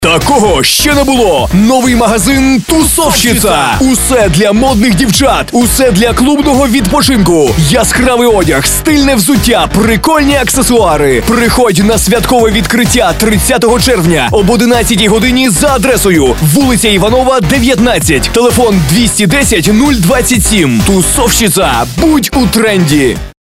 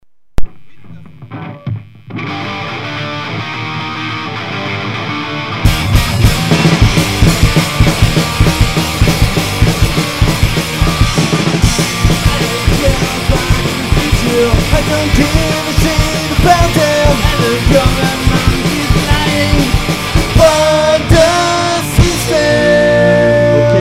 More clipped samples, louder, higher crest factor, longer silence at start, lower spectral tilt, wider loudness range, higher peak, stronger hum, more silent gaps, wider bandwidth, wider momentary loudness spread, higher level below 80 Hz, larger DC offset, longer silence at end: about the same, 0.4% vs 0.5%; first, -7 LUFS vs -12 LUFS; about the same, 8 dB vs 12 dB; second, 0 s vs 0.4 s; about the same, -4 dB/octave vs -5 dB/octave; second, 0 LU vs 9 LU; about the same, 0 dBFS vs 0 dBFS; neither; neither; about the same, 16.5 kHz vs 16.5 kHz; second, 1 LU vs 11 LU; about the same, -20 dBFS vs -18 dBFS; second, under 0.1% vs 0.9%; first, 0.2 s vs 0 s